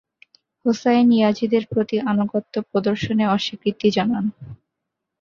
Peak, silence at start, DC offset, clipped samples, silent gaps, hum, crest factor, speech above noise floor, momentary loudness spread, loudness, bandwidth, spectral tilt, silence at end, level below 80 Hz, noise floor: -4 dBFS; 0.65 s; under 0.1%; under 0.1%; none; none; 16 dB; 61 dB; 8 LU; -20 LUFS; 7.2 kHz; -6.5 dB/octave; 0.65 s; -56 dBFS; -81 dBFS